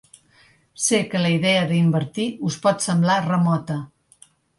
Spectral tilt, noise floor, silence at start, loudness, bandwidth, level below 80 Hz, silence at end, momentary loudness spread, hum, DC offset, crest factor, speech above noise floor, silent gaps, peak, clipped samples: -5 dB/octave; -56 dBFS; 0.8 s; -21 LUFS; 11.5 kHz; -62 dBFS; 0.75 s; 7 LU; none; under 0.1%; 16 dB; 36 dB; none; -6 dBFS; under 0.1%